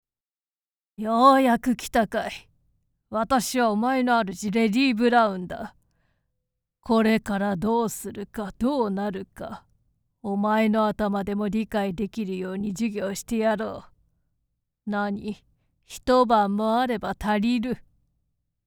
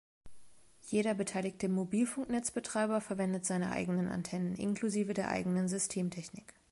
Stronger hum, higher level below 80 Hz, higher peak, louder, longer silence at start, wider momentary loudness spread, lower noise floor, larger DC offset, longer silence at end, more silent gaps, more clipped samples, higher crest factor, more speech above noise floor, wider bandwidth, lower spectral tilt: neither; first, -52 dBFS vs -66 dBFS; first, -4 dBFS vs -18 dBFS; first, -24 LUFS vs -35 LUFS; first, 1 s vs 0.25 s; first, 16 LU vs 4 LU; first, under -90 dBFS vs -57 dBFS; neither; first, 0.85 s vs 0.3 s; neither; neither; about the same, 20 dB vs 16 dB; first, over 66 dB vs 22 dB; first, 19 kHz vs 11.5 kHz; about the same, -5.5 dB/octave vs -5.5 dB/octave